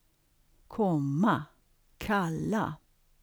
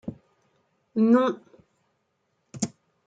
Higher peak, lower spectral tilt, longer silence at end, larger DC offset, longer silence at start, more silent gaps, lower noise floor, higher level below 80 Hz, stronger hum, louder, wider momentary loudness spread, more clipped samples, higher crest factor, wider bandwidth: second, -14 dBFS vs -10 dBFS; about the same, -7 dB/octave vs -6 dB/octave; about the same, 0.45 s vs 0.4 s; neither; first, 0.7 s vs 0.05 s; neither; second, -68 dBFS vs -74 dBFS; first, -58 dBFS vs -68 dBFS; neither; second, -30 LUFS vs -25 LUFS; about the same, 16 LU vs 18 LU; neither; about the same, 18 dB vs 18 dB; first, over 20 kHz vs 9.2 kHz